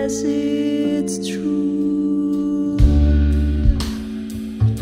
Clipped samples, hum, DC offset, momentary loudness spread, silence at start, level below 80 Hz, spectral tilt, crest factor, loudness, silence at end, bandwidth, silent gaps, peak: under 0.1%; none; under 0.1%; 8 LU; 0 s; -22 dBFS; -7 dB/octave; 16 dB; -19 LUFS; 0 s; 12 kHz; none; -2 dBFS